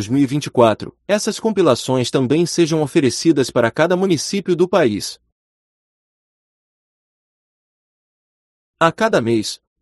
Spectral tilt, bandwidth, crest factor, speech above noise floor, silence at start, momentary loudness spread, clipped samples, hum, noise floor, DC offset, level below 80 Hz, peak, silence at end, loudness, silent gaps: -5 dB/octave; 12.5 kHz; 18 dB; over 74 dB; 0 s; 5 LU; under 0.1%; none; under -90 dBFS; under 0.1%; -58 dBFS; 0 dBFS; 0.25 s; -17 LUFS; 5.32-8.74 s